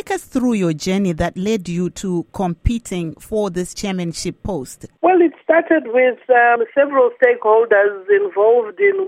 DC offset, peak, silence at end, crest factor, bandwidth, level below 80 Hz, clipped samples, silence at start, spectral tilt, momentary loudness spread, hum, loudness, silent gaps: under 0.1%; 0 dBFS; 0 s; 16 dB; 15.5 kHz; -38 dBFS; under 0.1%; 0.05 s; -6 dB/octave; 11 LU; none; -17 LUFS; none